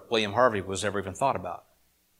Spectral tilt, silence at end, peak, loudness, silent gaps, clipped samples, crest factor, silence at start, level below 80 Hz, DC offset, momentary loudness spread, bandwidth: -4 dB/octave; 0.6 s; -8 dBFS; -27 LUFS; none; under 0.1%; 20 dB; 0 s; -64 dBFS; under 0.1%; 13 LU; 16 kHz